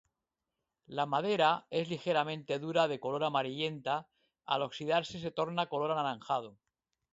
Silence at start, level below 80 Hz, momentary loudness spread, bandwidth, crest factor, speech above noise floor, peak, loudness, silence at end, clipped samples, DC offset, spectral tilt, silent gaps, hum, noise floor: 0.9 s; -76 dBFS; 8 LU; 7.6 kHz; 20 dB; 56 dB; -14 dBFS; -33 LUFS; 0.6 s; under 0.1%; under 0.1%; -3 dB/octave; none; none; -89 dBFS